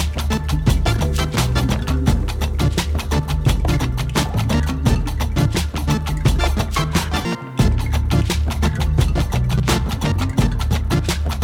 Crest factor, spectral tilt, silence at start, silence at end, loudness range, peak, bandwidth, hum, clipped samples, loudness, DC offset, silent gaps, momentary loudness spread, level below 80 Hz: 12 dB; -5.5 dB/octave; 0 s; 0 s; 1 LU; -6 dBFS; 17.5 kHz; none; under 0.1%; -20 LUFS; under 0.1%; none; 3 LU; -22 dBFS